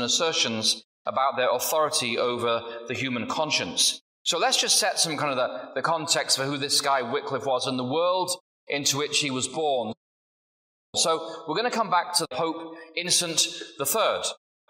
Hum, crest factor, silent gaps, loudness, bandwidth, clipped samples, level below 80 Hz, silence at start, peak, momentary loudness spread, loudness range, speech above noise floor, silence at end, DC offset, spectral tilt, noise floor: none; 18 dB; 0.84-1.05 s, 4.01-4.25 s, 8.40-8.67 s, 9.97-10.93 s; -25 LUFS; 16 kHz; under 0.1%; -74 dBFS; 0 s; -8 dBFS; 8 LU; 4 LU; over 64 dB; 0.35 s; under 0.1%; -1.5 dB/octave; under -90 dBFS